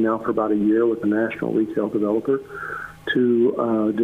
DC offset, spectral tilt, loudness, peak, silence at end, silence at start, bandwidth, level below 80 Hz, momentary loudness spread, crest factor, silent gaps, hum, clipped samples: under 0.1%; -8 dB/octave; -21 LUFS; -8 dBFS; 0 s; 0 s; 4.1 kHz; -58 dBFS; 9 LU; 12 dB; none; none; under 0.1%